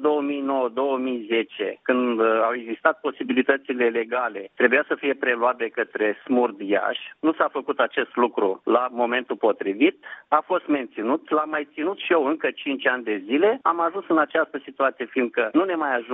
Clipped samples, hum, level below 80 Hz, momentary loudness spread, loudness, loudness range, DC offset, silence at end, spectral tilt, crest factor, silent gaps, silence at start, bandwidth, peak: under 0.1%; none; -76 dBFS; 6 LU; -23 LUFS; 1 LU; under 0.1%; 0 s; -1.5 dB/octave; 20 dB; none; 0 s; 4 kHz; -2 dBFS